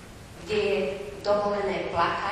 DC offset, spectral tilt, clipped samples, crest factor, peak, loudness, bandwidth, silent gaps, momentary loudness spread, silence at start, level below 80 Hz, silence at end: under 0.1%; -5 dB/octave; under 0.1%; 16 dB; -12 dBFS; -27 LUFS; 12.5 kHz; none; 8 LU; 0 s; -52 dBFS; 0 s